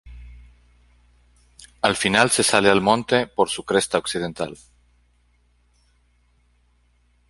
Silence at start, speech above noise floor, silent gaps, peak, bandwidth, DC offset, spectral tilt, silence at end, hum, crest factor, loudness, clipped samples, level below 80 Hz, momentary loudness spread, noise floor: 0.05 s; 41 dB; none; 0 dBFS; 12 kHz; under 0.1%; -3 dB/octave; 2.75 s; 60 Hz at -50 dBFS; 24 dB; -20 LUFS; under 0.1%; -50 dBFS; 11 LU; -61 dBFS